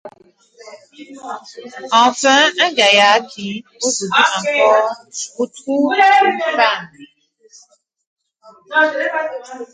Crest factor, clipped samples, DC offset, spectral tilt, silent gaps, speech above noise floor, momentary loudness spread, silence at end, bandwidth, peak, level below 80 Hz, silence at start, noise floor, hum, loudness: 16 dB; under 0.1%; under 0.1%; -1.5 dB/octave; 8.06-8.17 s; 37 dB; 19 LU; 0.1 s; 9.6 kHz; 0 dBFS; -70 dBFS; 0.05 s; -53 dBFS; none; -14 LUFS